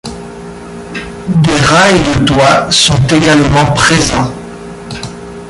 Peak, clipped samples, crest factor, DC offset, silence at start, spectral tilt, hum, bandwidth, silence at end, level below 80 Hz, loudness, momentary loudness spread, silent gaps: 0 dBFS; under 0.1%; 10 dB; under 0.1%; 0.05 s; -4.5 dB/octave; none; 11.5 kHz; 0 s; -30 dBFS; -8 LUFS; 20 LU; none